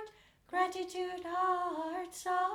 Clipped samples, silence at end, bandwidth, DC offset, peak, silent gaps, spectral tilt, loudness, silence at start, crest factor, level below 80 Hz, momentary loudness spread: under 0.1%; 0 s; 17 kHz; under 0.1%; -20 dBFS; none; -2.5 dB/octave; -36 LUFS; 0 s; 16 dB; -72 dBFS; 7 LU